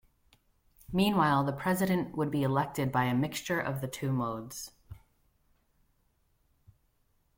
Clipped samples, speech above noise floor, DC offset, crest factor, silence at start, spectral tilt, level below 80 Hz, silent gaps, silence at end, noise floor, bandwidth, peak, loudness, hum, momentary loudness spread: under 0.1%; 42 dB; under 0.1%; 20 dB; 0.9 s; -6 dB/octave; -60 dBFS; none; 2.4 s; -72 dBFS; 16.5 kHz; -12 dBFS; -30 LUFS; none; 10 LU